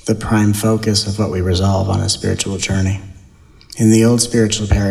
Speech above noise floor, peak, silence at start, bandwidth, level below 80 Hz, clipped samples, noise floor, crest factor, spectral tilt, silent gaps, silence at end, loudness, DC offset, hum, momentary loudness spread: 29 dB; 0 dBFS; 0.05 s; 14.5 kHz; -32 dBFS; under 0.1%; -44 dBFS; 14 dB; -5 dB/octave; none; 0 s; -15 LUFS; under 0.1%; none; 7 LU